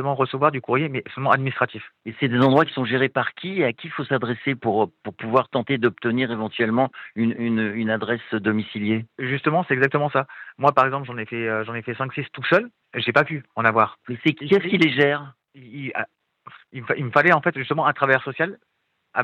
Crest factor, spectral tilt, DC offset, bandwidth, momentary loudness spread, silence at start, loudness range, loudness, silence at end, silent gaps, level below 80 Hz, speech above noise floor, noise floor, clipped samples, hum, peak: 22 dB; -8 dB/octave; under 0.1%; 8.2 kHz; 11 LU; 0 s; 2 LU; -22 LUFS; 0 s; none; -70 dBFS; 26 dB; -48 dBFS; under 0.1%; none; -2 dBFS